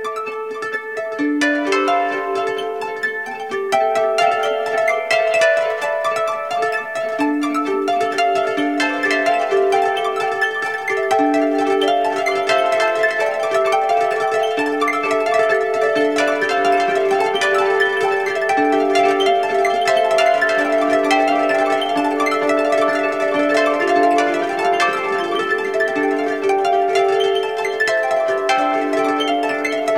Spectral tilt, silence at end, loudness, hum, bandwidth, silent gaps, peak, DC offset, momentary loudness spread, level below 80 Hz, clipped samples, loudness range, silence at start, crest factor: -3 dB/octave; 0 s; -17 LUFS; none; 15.5 kHz; none; -2 dBFS; 0.3%; 5 LU; -68 dBFS; under 0.1%; 3 LU; 0 s; 16 dB